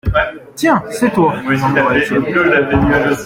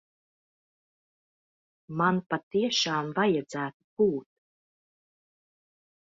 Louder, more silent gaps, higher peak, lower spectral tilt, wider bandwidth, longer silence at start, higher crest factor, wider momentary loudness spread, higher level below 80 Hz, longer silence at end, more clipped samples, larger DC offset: first, -14 LUFS vs -28 LUFS; second, none vs 2.43-2.51 s, 3.74-3.97 s; first, 0 dBFS vs -10 dBFS; first, -6 dB/octave vs -4.5 dB/octave; first, 16.5 kHz vs 7.8 kHz; second, 0.05 s vs 1.9 s; second, 12 dB vs 22 dB; second, 4 LU vs 10 LU; first, -32 dBFS vs -72 dBFS; second, 0 s vs 1.8 s; neither; neither